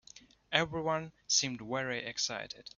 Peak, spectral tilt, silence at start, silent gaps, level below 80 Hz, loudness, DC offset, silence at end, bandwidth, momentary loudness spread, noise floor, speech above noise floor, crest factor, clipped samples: -12 dBFS; -2 dB/octave; 0.15 s; none; -68 dBFS; -33 LUFS; under 0.1%; 0.1 s; 7.4 kHz; 7 LU; -58 dBFS; 24 dB; 24 dB; under 0.1%